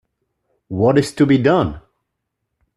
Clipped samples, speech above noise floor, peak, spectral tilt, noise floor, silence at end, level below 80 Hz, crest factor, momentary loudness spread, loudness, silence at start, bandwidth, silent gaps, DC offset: under 0.1%; 61 dB; 0 dBFS; -7 dB/octave; -76 dBFS; 1 s; -46 dBFS; 18 dB; 9 LU; -16 LUFS; 0.7 s; 12 kHz; none; under 0.1%